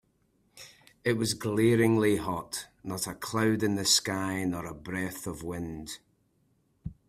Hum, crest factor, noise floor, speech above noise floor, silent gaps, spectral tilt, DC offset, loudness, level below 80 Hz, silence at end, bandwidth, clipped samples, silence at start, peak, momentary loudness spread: none; 20 dB; -70 dBFS; 42 dB; none; -4 dB/octave; under 0.1%; -29 LUFS; -58 dBFS; 0.15 s; 16 kHz; under 0.1%; 0.55 s; -10 dBFS; 18 LU